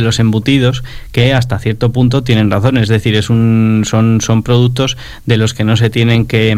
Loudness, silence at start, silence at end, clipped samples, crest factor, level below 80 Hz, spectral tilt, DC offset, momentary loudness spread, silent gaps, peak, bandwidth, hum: -12 LUFS; 0 s; 0 s; 0.1%; 10 dB; -34 dBFS; -6 dB/octave; under 0.1%; 5 LU; none; 0 dBFS; 14 kHz; none